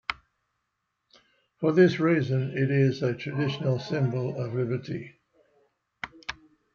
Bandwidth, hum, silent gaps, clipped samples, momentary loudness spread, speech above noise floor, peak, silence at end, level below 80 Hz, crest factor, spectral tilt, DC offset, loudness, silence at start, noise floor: 7 kHz; none; none; under 0.1%; 18 LU; 55 dB; -8 dBFS; 0.4 s; -64 dBFS; 20 dB; -8 dB/octave; under 0.1%; -27 LUFS; 0.1 s; -80 dBFS